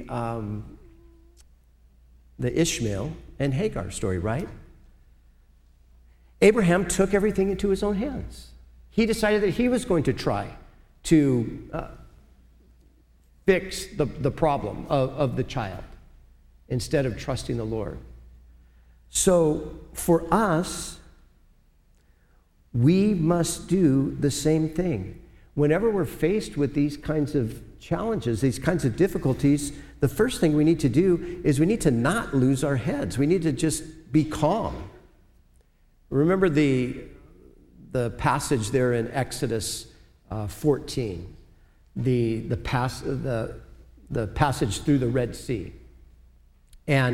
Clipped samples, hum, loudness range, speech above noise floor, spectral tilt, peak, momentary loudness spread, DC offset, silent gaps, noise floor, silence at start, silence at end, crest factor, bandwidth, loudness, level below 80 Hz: under 0.1%; none; 6 LU; 36 dB; -6 dB/octave; -4 dBFS; 13 LU; under 0.1%; none; -59 dBFS; 0 s; 0 s; 22 dB; 16 kHz; -25 LUFS; -44 dBFS